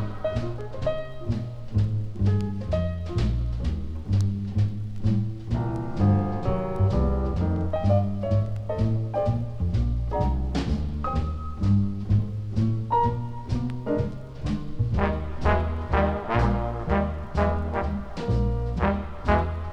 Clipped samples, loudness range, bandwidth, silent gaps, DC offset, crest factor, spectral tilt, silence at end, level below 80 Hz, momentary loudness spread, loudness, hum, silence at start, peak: under 0.1%; 2 LU; 7.6 kHz; none; under 0.1%; 18 dB; -9 dB/octave; 0 s; -32 dBFS; 7 LU; -27 LUFS; none; 0 s; -8 dBFS